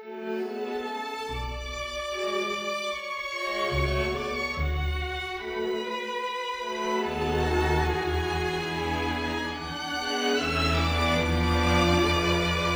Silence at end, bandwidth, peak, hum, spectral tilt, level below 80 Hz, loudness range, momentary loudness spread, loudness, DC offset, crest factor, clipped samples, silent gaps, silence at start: 0 s; over 20 kHz; -10 dBFS; none; -5 dB/octave; -38 dBFS; 5 LU; 9 LU; -28 LUFS; under 0.1%; 16 dB; under 0.1%; none; 0 s